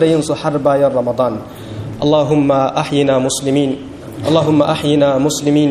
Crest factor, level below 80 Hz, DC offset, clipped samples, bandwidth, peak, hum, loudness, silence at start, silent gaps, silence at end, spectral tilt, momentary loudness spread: 14 dB; -46 dBFS; under 0.1%; under 0.1%; 14 kHz; 0 dBFS; none; -14 LUFS; 0 s; none; 0 s; -5.5 dB/octave; 12 LU